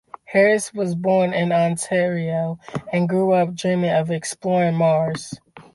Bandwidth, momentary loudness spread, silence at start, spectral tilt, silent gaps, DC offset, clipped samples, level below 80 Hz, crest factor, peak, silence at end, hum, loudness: 11.5 kHz; 8 LU; 0.3 s; -6 dB/octave; none; under 0.1%; under 0.1%; -60 dBFS; 14 dB; -6 dBFS; 0.15 s; none; -20 LUFS